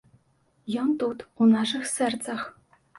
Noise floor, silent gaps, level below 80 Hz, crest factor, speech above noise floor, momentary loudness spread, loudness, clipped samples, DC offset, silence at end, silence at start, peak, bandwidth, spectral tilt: -66 dBFS; none; -70 dBFS; 16 dB; 42 dB; 13 LU; -26 LUFS; under 0.1%; under 0.1%; 0.5 s; 0.65 s; -10 dBFS; 11.5 kHz; -4 dB/octave